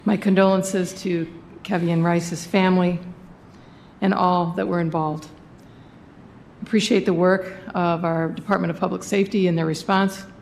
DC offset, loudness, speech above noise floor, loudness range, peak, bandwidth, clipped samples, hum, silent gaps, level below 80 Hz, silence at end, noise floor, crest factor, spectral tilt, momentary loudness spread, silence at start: under 0.1%; -21 LUFS; 25 dB; 4 LU; -4 dBFS; 14 kHz; under 0.1%; none; none; -56 dBFS; 0 s; -46 dBFS; 18 dB; -6 dB/octave; 9 LU; 0.05 s